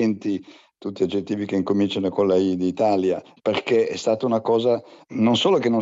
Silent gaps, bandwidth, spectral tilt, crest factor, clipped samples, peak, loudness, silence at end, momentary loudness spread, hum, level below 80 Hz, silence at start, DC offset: none; 7.8 kHz; -6 dB/octave; 14 dB; under 0.1%; -8 dBFS; -22 LUFS; 0 s; 8 LU; none; -70 dBFS; 0 s; under 0.1%